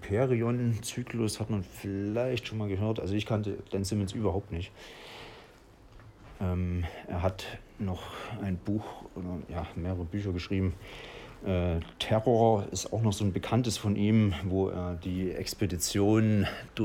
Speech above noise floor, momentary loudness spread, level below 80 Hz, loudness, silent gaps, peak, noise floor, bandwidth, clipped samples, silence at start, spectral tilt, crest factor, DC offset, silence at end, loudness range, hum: 25 dB; 14 LU; -50 dBFS; -31 LUFS; none; -10 dBFS; -55 dBFS; 16.5 kHz; under 0.1%; 0 s; -6 dB/octave; 20 dB; under 0.1%; 0 s; 8 LU; none